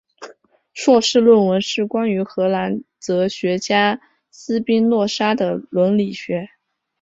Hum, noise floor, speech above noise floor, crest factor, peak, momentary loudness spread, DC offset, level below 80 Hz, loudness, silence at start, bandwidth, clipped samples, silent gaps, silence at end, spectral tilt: none; -48 dBFS; 31 dB; 16 dB; -2 dBFS; 13 LU; under 0.1%; -62 dBFS; -18 LUFS; 0.2 s; 8 kHz; under 0.1%; none; 0.55 s; -5 dB/octave